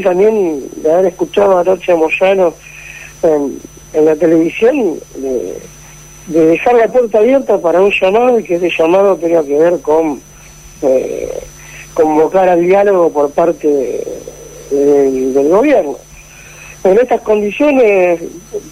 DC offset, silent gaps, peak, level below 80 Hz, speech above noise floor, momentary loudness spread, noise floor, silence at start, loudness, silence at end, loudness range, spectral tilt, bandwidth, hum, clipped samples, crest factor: under 0.1%; none; -2 dBFS; -44 dBFS; 25 dB; 16 LU; -36 dBFS; 0 s; -11 LUFS; 0 s; 3 LU; -5.5 dB/octave; 15.5 kHz; none; under 0.1%; 10 dB